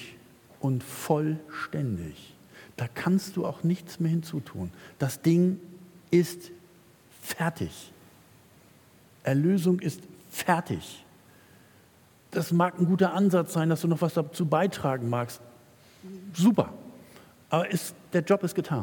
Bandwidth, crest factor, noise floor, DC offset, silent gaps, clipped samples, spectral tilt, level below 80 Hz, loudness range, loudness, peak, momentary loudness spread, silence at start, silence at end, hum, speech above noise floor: 18 kHz; 22 dB; -58 dBFS; under 0.1%; none; under 0.1%; -6.5 dB/octave; -68 dBFS; 5 LU; -28 LUFS; -6 dBFS; 19 LU; 0 s; 0 s; none; 31 dB